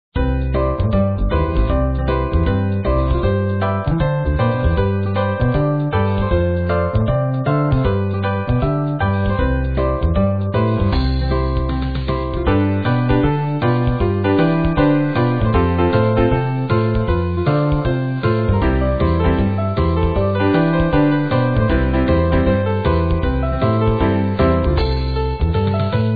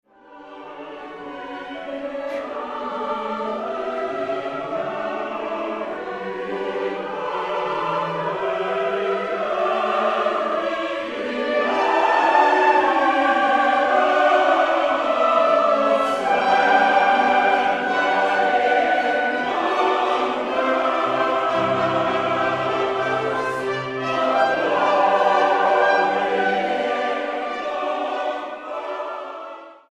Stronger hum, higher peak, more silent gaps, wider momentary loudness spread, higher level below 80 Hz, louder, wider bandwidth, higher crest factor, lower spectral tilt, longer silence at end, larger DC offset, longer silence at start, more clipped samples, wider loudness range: neither; about the same, -2 dBFS vs -4 dBFS; neither; second, 4 LU vs 12 LU; first, -24 dBFS vs -62 dBFS; first, -17 LUFS vs -20 LUFS; second, 4.9 kHz vs 11 kHz; about the same, 14 dB vs 18 dB; first, -11 dB/octave vs -4.5 dB/octave; second, 0 s vs 0.15 s; first, 0.6% vs under 0.1%; second, 0.15 s vs 0.3 s; neither; second, 2 LU vs 9 LU